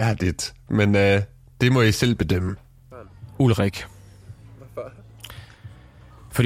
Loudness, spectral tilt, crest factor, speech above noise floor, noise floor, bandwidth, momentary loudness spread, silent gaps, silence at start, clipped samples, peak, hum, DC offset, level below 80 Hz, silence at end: -21 LUFS; -6 dB/octave; 18 dB; 27 dB; -47 dBFS; 16 kHz; 23 LU; none; 0 s; under 0.1%; -4 dBFS; none; under 0.1%; -44 dBFS; 0 s